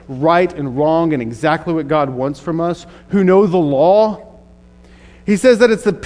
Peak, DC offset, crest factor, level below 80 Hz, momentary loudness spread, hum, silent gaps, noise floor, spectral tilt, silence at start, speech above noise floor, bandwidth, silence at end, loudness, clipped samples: 0 dBFS; under 0.1%; 14 dB; -46 dBFS; 9 LU; none; none; -43 dBFS; -6.5 dB/octave; 0.1 s; 29 dB; 11 kHz; 0 s; -15 LUFS; under 0.1%